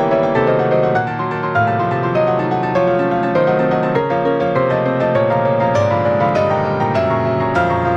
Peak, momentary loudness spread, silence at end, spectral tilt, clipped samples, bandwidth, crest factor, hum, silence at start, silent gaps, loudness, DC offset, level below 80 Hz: -4 dBFS; 2 LU; 0 s; -8 dB/octave; under 0.1%; 7.8 kHz; 12 dB; none; 0 s; none; -16 LUFS; under 0.1%; -48 dBFS